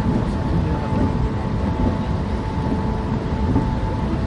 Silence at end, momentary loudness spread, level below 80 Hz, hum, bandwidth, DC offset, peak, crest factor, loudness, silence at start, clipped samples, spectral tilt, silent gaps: 0 s; 3 LU; -26 dBFS; none; 10.5 kHz; under 0.1%; -6 dBFS; 14 dB; -22 LUFS; 0 s; under 0.1%; -8.5 dB/octave; none